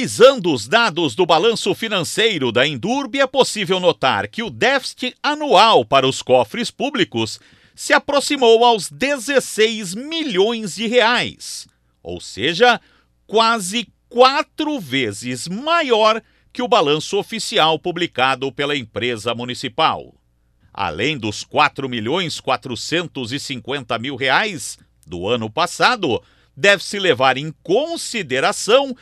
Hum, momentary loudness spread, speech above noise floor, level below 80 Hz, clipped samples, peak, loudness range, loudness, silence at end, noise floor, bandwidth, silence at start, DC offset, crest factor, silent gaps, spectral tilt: none; 11 LU; 40 dB; -58 dBFS; under 0.1%; 0 dBFS; 5 LU; -17 LUFS; 0.05 s; -58 dBFS; 15 kHz; 0 s; under 0.1%; 18 dB; none; -3.5 dB/octave